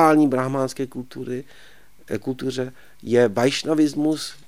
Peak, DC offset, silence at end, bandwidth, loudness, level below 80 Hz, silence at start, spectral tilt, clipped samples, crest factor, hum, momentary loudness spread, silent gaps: -2 dBFS; 0.6%; 0.15 s; 15.5 kHz; -22 LUFS; -60 dBFS; 0 s; -5.5 dB/octave; under 0.1%; 18 dB; none; 14 LU; none